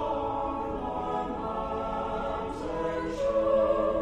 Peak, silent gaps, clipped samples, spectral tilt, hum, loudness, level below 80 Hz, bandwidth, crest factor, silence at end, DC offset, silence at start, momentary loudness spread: -14 dBFS; none; under 0.1%; -7 dB/octave; none; -30 LUFS; -46 dBFS; 9.6 kHz; 14 dB; 0 s; under 0.1%; 0 s; 8 LU